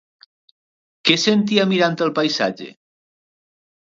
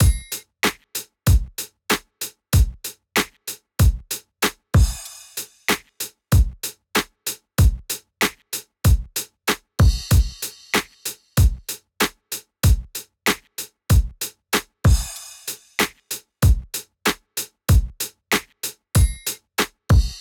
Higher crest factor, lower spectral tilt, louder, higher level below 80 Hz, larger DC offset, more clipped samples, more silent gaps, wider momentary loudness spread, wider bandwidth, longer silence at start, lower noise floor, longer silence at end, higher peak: first, 22 dB vs 14 dB; about the same, -4.5 dB/octave vs -4 dB/octave; first, -18 LUFS vs -22 LUFS; second, -68 dBFS vs -24 dBFS; neither; neither; neither; second, 9 LU vs 12 LU; second, 7.8 kHz vs over 20 kHz; first, 1.05 s vs 0 s; first, under -90 dBFS vs -37 dBFS; first, 1.25 s vs 0 s; first, 0 dBFS vs -8 dBFS